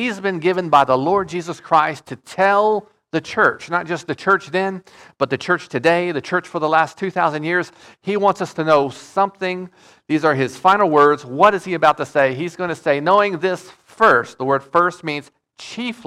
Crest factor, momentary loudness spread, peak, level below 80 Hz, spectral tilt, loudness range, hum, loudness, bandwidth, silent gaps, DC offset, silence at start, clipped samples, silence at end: 16 dB; 12 LU; -2 dBFS; -60 dBFS; -5.5 dB/octave; 4 LU; none; -18 LUFS; 13 kHz; none; under 0.1%; 0 s; under 0.1%; 0.1 s